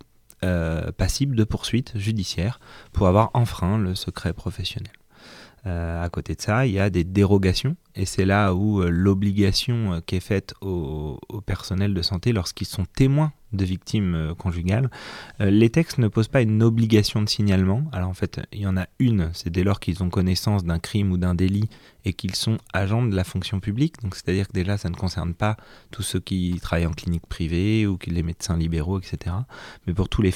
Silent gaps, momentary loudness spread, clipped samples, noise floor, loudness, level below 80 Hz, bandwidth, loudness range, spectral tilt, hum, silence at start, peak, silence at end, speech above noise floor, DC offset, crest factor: none; 10 LU; under 0.1%; -47 dBFS; -23 LUFS; -38 dBFS; 15.5 kHz; 5 LU; -6.5 dB/octave; none; 0.4 s; -4 dBFS; 0 s; 24 dB; under 0.1%; 18 dB